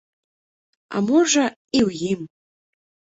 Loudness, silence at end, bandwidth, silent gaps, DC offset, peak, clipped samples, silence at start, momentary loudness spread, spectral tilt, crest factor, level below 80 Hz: -21 LUFS; 0.8 s; 8.2 kHz; 1.56-1.68 s; under 0.1%; -6 dBFS; under 0.1%; 0.9 s; 12 LU; -4 dB/octave; 18 dB; -58 dBFS